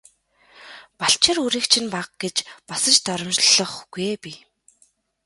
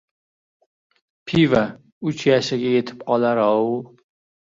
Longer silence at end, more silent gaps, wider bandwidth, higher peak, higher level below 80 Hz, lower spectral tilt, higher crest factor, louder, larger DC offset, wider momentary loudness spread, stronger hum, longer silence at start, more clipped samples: first, 0.9 s vs 0.55 s; second, none vs 1.92-2.01 s; first, 12 kHz vs 7.8 kHz; about the same, -2 dBFS vs -4 dBFS; second, -62 dBFS vs -56 dBFS; second, -1 dB/octave vs -6.5 dB/octave; about the same, 22 dB vs 18 dB; about the same, -19 LUFS vs -20 LUFS; neither; first, 14 LU vs 11 LU; neither; second, 0.6 s vs 1.25 s; neither